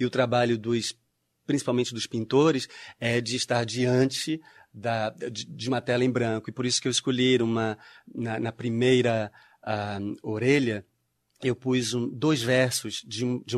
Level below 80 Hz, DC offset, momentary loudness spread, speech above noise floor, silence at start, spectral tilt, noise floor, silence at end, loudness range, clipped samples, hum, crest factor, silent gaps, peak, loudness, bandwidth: -66 dBFS; under 0.1%; 11 LU; 41 dB; 0 s; -4.5 dB/octave; -68 dBFS; 0 s; 2 LU; under 0.1%; none; 18 dB; none; -8 dBFS; -26 LUFS; 13.5 kHz